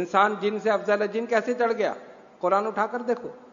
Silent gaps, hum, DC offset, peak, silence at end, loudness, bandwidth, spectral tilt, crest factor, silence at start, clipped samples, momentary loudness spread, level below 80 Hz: none; none; under 0.1%; -6 dBFS; 0.05 s; -25 LUFS; 7.4 kHz; -5 dB/octave; 18 dB; 0 s; under 0.1%; 7 LU; -78 dBFS